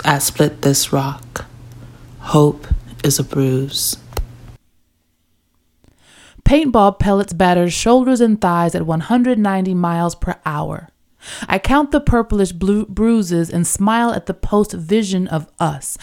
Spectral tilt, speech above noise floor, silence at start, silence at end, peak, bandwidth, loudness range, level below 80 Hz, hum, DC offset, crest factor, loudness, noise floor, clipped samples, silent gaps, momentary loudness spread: -5 dB/octave; 47 dB; 0 s; 0.05 s; 0 dBFS; 17 kHz; 6 LU; -30 dBFS; none; under 0.1%; 16 dB; -16 LUFS; -62 dBFS; under 0.1%; none; 12 LU